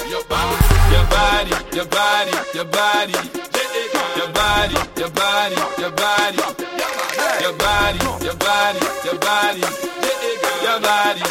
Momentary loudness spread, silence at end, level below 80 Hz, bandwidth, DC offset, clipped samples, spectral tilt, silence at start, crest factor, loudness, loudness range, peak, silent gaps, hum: 7 LU; 0 s; -26 dBFS; 17 kHz; under 0.1%; under 0.1%; -3.5 dB/octave; 0 s; 18 dB; -18 LUFS; 2 LU; 0 dBFS; none; none